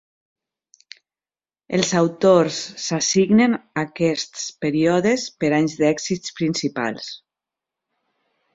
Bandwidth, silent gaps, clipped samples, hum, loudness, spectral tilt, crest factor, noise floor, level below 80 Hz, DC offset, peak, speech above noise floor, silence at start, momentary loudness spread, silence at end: 7.8 kHz; none; under 0.1%; none; -20 LUFS; -4.5 dB/octave; 20 dB; under -90 dBFS; -60 dBFS; under 0.1%; -2 dBFS; over 70 dB; 1.7 s; 11 LU; 1.35 s